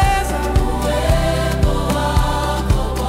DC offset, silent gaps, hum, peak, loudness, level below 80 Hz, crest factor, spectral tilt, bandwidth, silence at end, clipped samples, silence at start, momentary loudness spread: under 0.1%; none; none; -4 dBFS; -18 LUFS; -20 dBFS; 12 dB; -5.5 dB/octave; 16 kHz; 0 s; under 0.1%; 0 s; 2 LU